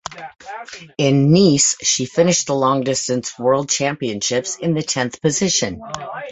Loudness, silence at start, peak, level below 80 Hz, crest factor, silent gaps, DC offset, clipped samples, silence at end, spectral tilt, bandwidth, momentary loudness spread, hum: -17 LUFS; 0.1 s; -2 dBFS; -52 dBFS; 16 dB; none; under 0.1%; under 0.1%; 0 s; -4 dB/octave; 8.4 kHz; 19 LU; none